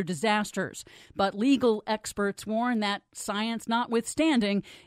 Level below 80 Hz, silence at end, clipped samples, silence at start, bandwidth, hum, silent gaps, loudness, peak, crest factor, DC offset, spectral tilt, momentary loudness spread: -62 dBFS; 0.1 s; under 0.1%; 0 s; 15.5 kHz; none; none; -28 LUFS; -12 dBFS; 16 dB; under 0.1%; -4.5 dB/octave; 9 LU